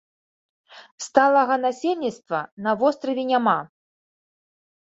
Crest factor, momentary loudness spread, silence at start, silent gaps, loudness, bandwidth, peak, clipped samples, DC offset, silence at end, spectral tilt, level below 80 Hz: 22 dB; 10 LU; 0.7 s; 0.92-0.98 s, 2.52-2.57 s; -22 LUFS; 8 kHz; -2 dBFS; under 0.1%; under 0.1%; 1.3 s; -4.5 dB/octave; -72 dBFS